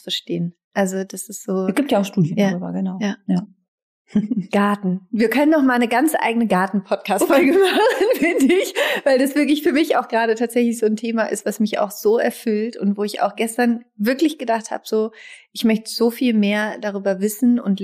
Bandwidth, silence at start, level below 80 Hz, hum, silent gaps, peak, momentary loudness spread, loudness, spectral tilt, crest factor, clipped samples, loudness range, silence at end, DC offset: 15.5 kHz; 0.05 s; -64 dBFS; none; 0.64-0.71 s, 3.68-4.05 s; -4 dBFS; 8 LU; -19 LUFS; -5 dB/octave; 14 dB; under 0.1%; 5 LU; 0 s; under 0.1%